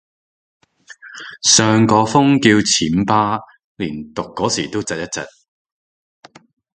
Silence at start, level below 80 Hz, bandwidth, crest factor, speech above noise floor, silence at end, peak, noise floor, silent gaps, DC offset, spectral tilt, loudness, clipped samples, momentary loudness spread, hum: 1.05 s; -50 dBFS; 9.6 kHz; 18 dB; 26 dB; 1.5 s; 0 dBFS; -42 dBFS; 3.64-3.75 s; under 0.1%; -3.5 dB/octave; -15 LUFS; under 0.1%; 16 LU; none